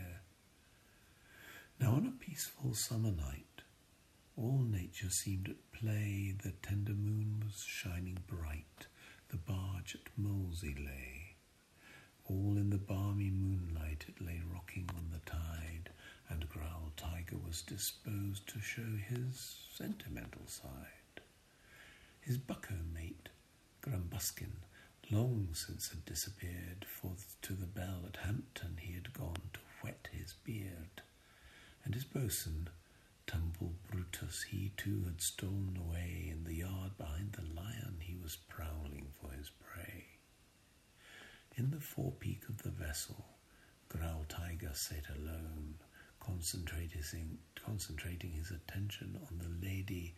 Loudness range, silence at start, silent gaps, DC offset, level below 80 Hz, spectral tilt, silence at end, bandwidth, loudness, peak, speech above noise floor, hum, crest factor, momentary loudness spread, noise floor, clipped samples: 7 LU; 0 s; none; under 0.1%; -54 dBFS; -5 dB/octave; 0 s; 15 kHz; -43 LUFS; -22 dBFS; 26 dB; none; 22 dB; 17 LU; -68 dBFS; under 0.1%